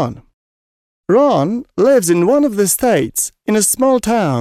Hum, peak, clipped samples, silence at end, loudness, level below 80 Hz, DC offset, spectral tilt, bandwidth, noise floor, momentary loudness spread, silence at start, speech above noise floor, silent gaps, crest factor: none; -2 dBFS; under 0.1%; 0 s; -14 LUFS; -48 dBFS; under 0.1%; -4.5 dB/octave; 16 kHz; under -90 dBFS; 7 LU; 0 s; over 76 dB; 0.34-1.04 s; 12 dB